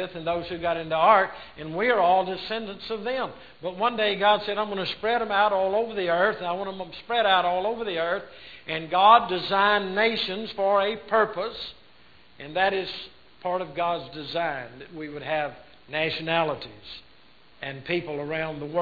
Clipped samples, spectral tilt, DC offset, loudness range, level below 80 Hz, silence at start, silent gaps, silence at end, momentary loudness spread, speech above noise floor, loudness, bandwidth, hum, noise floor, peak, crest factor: under 0.1%; -6.5 dB/octave; 0.2%; 8 LU; -60 dBFS; 0 s; none; 0 s; 16 LU; 32 dB; -25 LUFS; 5 kHz; none; -57 dBFS; -2 dBFS; 22 dB